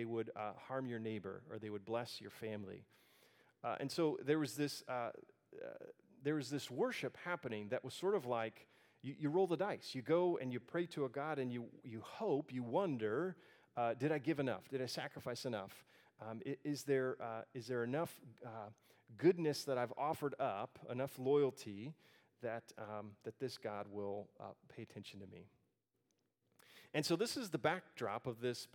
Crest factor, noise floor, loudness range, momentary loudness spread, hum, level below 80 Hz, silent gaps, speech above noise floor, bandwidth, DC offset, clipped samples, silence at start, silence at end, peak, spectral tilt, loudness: 22 dB; -85 dBFS; 8 LU; 16 LU; none; -88 dBFS; none; 43 dB; 19 kHz; under 0.1%; under 0.1%; 0 s; 0.1 s; -20 dBFS; -5.5 dB/octave; -42 LUFS